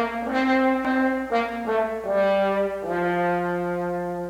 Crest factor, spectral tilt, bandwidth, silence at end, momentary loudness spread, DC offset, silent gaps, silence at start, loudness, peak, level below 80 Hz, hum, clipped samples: 14 dB; -7 dB/octave; 16 kHz; 0 s; 5 LU; under 0.1%; none; 0 s; -23 LUFS; -10 dBFS; -54 dBFS; none; under 0.1%